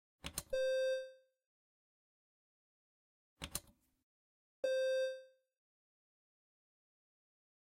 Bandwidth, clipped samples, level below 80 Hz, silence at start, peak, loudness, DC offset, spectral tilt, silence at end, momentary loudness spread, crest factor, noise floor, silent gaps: 16 kHz; under 0.1%; -68 dBFS; 0.25 s; -22 dBFS; -40 LUFS; under 0.1%; -2 dB/octave; 2.5 s; 14 LU; 24 dB; under -90 dBFS; 1.46-3.37 s, 4.03-4.63 s